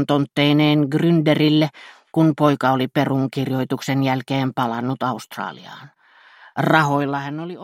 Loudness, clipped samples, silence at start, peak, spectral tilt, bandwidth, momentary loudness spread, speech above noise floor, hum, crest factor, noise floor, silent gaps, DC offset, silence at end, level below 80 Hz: -19 LUFS; under 0.1%; 0 s; 0 dBFS; -7 dB/octave; 15.5 kHz; 12 LU; 30 dB; none; 20 dB; -49 dBFS; none; under 0.1%; 0 s; -62 dBFS